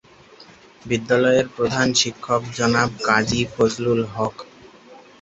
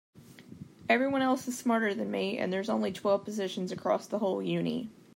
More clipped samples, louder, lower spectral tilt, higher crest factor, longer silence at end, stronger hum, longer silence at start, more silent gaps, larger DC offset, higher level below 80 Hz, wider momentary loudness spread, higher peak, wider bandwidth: neither; first, -20 LUFS vs -31 LUFS; about the same, -4 dB/octave vs -5 dB/octave; about the same, 20 dB vs 18 dB; about the same, 0.25 s vs 0.25 s; neither; first, 0.4 s vs 0.15 s; neither; neither; first, -50 dBFS vs -74 dBFS; about the same, 8 LU vs 7 LU; first, -2 dBFS vs -12 dBFS; second, 8.2 kHz vs 16 kHz